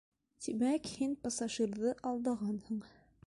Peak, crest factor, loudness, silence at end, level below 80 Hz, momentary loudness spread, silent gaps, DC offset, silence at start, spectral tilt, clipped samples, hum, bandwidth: -24 dBFS; 14 dB; -37 LUFS; 0.4 s; -70 dBFS; 8 LU; none; under 0.1%; 0.4 s; -4.5 dB/octave; under 0.1%; none; 11.5 kHz